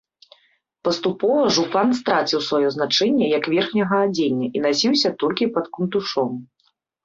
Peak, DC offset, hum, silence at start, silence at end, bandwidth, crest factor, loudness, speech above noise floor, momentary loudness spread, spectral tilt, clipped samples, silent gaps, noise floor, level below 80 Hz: -4 dBFS; under 0.1%; none; 0.85 s; 0.6 s; 7.6 kHz; 18 dB; -20 LUFS; 47 dB; 6 LU; -4.5 dB/octave; under 0.1%; none; -67 dBFS; -64 dBFS